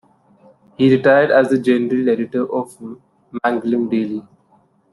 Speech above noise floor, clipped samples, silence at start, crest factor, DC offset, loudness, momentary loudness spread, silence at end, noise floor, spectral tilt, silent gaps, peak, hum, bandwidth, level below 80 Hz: 40 dB; under 0.1%; 0.8 s; 16 dB; under 0.1%; -17 LUFS; 18 LU; 0.7 s; -56 dBFS; -7.5 dB/octave; none; -2 dBFS; none; 11.5 kHz; -62 dBFS